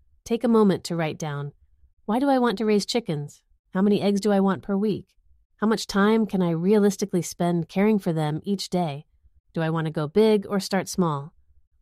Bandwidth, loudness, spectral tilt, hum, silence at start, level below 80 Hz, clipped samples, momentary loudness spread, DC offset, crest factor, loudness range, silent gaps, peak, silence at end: 15 kHz; -24 LUFS; -6 dB/octave; none; 0.25 s; -58 dBFS; under 0.1%; 12 LU; under 0.1%; 16 dB; 3 LU; 1.93-1.97 s, 3.59-3.64 s, 5.45-5.50 s, 9.40-9.44 s; -8 dBFS; 0.5 s